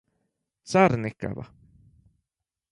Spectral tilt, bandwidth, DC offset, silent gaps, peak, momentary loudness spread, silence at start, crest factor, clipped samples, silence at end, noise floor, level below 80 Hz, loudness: -6.5 dB/octave; 11 kHz; under 0.1%; none; -4 dBFS; 19 LU; 0.65 s; 24 dB; under 0.1%; 1.25 s; -87 dBFS; -56 dBFS; -24 LUFS